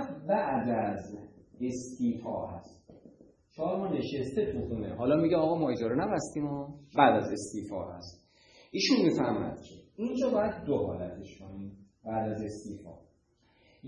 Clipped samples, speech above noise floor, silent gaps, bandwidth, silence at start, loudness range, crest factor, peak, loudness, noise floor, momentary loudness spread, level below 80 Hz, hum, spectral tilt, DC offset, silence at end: under 0.1%; 38 dB; none; 10.5 kHz; 0 s; 7 LU; 24 dB; -8 dBFS; -31 LUFS; -68 dBFS; 20 LU; -60 dBFS; none; -6 dB/octave; under 0.1%; 0 s